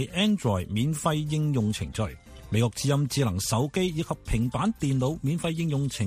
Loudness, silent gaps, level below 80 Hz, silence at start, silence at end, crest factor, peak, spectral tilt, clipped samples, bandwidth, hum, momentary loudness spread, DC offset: -27 LUFS; none; -44 dBFS; 0 s; 0 s; 16 dB; -10 dBFS; -5.5 dB/octave; under 0.1%; 15.5 kHz; none; 5 LU; under 0.1%